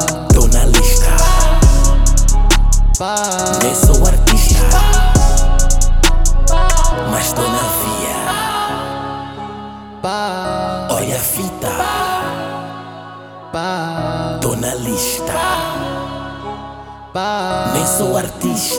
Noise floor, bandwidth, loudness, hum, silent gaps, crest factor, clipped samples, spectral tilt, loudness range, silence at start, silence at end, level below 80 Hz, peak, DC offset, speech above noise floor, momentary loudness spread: -33 dBFS; 18 kHz; -15 LUFS; none; none; 12 dB; under 0.1%; -4 dB/octave; 7 LU; 0 s; 0 s; -14 dBFS; 0 dBFS; under 0.1%; 15 dB; 15 LU